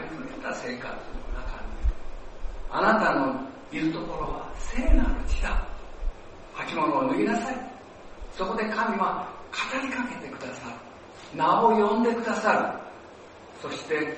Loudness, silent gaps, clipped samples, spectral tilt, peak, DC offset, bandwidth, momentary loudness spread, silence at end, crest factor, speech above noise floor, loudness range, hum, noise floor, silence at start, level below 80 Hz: -27 LUFS; none; under 0.1%; -5.5 dB/octave; -6 dBFS; under 0.1%; 8.4 kHz; 21 LU; 0 s; 20 dB; 21 dB; 5 LU; none; -46 dBFS; 0 s; -34 dBFS